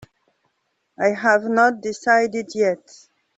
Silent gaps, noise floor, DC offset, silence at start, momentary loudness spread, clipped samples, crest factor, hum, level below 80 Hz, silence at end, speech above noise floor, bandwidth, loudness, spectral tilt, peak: none; -72 dBFS; under 0.1%; 1 s; 7 LU; under 0.1%; 18 dB; none; -66 dBFS; 0.6 s; 53 dB; 8.2 kHz; -19 LUFS; -4.5 dB/octave; -2 dBFS